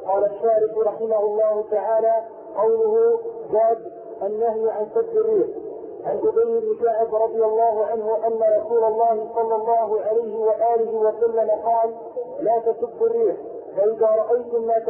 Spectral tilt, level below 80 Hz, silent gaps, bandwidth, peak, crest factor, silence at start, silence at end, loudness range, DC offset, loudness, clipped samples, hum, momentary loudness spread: -11 dB/octave; -66 dBFS; none; 2.4 kHz; -10 dBFS; 12 dB; 0 s; 0 s; 2 LU; under 0.1%; -21 LUFS; under 0.1%; none; 7 LU